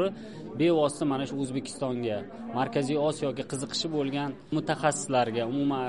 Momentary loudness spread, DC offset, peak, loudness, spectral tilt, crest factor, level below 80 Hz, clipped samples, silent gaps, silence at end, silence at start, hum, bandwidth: 7 LU; 0.2%; -10 dBFS; -29 LUFS; -5 dB/octave; 18 dB; -64 dBFS; under 0.1%; none; 0 s; 0 s; none; 11.5 kHz